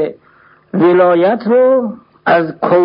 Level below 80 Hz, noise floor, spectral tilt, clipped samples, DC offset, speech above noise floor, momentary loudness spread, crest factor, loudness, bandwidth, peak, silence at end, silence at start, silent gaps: -60 dBFS; -47 dBFS; -10.5 dB/octave; under 0.1%; under 0.1%; 37 dB; 12 LU; 12 dB; -12 LUFS; 5.4 kHz; 0 dBFS; 0 s; 0 s; none